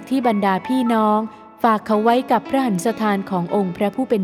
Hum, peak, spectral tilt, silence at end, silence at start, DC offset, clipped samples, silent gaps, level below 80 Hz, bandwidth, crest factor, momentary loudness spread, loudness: none; -2 dBFS; -6.5 dB/octave; 0 s; 0 s; under 0.1%; under 0.1%; none; -62 dBFS; 15.5 kHz; 16 dB; 5 LU; -19 LUFS